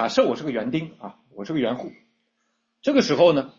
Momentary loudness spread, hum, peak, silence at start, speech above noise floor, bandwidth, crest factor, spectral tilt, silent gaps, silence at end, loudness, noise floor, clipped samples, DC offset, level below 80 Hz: 22 LU; none; -6 dBFS; 0 s; 51 dB; 7.6 kHz; 18 dB; -5.5 dB/octave; none; 0.1 s; -22 LUFS; -73 dBFS; under 0.1%; under 0.1%; -64 dBFS